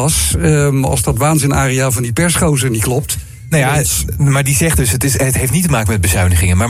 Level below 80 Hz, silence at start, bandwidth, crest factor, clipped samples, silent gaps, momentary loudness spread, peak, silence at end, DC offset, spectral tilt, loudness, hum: -26 dBFS; 0 s; 16 kHz; 12 dB; under 0.1%; none; 3 LU; -2 dBFS; 0 s; under 0.1%; -4.5 dB/octave; -13 LUFS; none